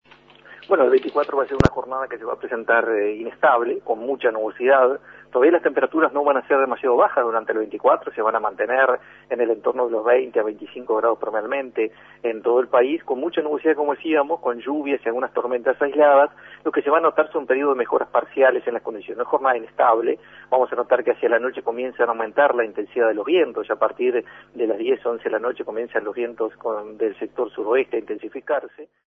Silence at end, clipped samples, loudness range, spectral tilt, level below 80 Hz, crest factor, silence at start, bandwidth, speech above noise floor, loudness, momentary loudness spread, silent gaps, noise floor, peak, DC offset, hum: 0.25 s; under 0.1%; 5 LU; -7.5 dB/octave; -50 dBFS; 20 dB; 0.5 s; 7 kHz; 28 dB; -21 LUFS; 10 LU; none; -48 dBFS; 0 dBFS; under 0.1%; 50 Hz at -60 dBFS